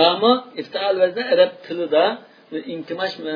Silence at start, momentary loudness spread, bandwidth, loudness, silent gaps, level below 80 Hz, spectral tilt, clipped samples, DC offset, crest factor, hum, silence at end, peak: 0 s; 13 LU; 5.4 kHz; -20 LUFS; none; -76 dBFS; -6 dB/octave; under 0.1%; under 0.1%; 18 dB; none; 0 s; -2 dBFS